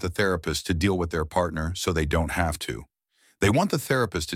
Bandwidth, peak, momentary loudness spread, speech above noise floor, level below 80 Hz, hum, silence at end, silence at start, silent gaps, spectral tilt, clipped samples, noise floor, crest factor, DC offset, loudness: 16.5 kHz; -8 dBFS; 5 LU; 36 dB; -38 dBFS; none; 0 s; 0 s; none; -5 dB/octave; under 0.1%; -61 dBFS; 18 dB; under 0.1%; -25 LUFS